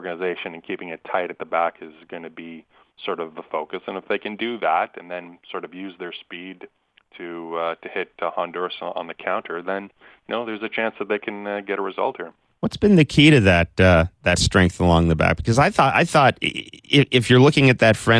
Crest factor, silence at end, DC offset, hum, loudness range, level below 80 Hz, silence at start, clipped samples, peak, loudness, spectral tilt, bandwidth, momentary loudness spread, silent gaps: 18 dB; 0 s; under 0.1%; none; 13 LU; -42 dBFS; 0 s; under 0.1%; -4 dBFS; -20 LUFS; -5.5 dB/octave; 11 kHz; 19 LU; none